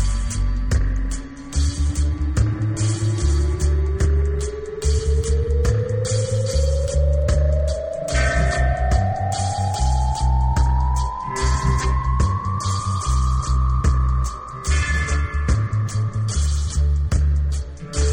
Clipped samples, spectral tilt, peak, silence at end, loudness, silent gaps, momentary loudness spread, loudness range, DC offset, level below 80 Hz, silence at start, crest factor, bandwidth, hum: under 0.1%; -5.5 dB/octave; -6 dBFS; 0 s; -21 LUFS; none; 5 LU; 1 LU; under 0.1%; -20 dBFS; 0 s; 14 dB; 10.5 kHz; none